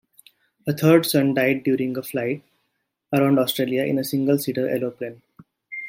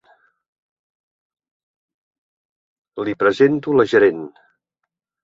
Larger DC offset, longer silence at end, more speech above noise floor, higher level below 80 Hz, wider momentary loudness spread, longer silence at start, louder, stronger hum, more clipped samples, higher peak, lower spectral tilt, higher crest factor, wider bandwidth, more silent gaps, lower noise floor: neither; second, 0 s vs 0.95 s; second, 54 dB vs 64 dB; second, -68 dBFS vs -62 dBFS; second, 14 LU vs 19 LU; second, 0.65 s vs 2.95 s; second, -21 LUFS vs -17 LUFS; neither; neither; about the same, -4 dBFS vs -2 dBFS; about the same, -6 dB/octave vs -7 dB/octave; about the same, 20 dB vs 20 dB; first, 16.5 kHz vs 7.6 kHz; neither; second, -75 dBFS vs -80 dBFS